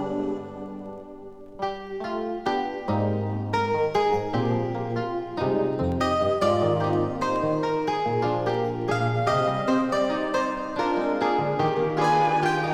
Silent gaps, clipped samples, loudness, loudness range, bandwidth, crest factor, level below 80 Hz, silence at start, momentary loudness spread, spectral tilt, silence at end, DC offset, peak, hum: none; under 0.1%; -25 LUFS; 4 LU; 12.5 kHz; 14 dB; -52 dBFS; 0 s; 10 LU; -6.5 dB/octave; 0 s; under 0.1%; -10 dBFS; none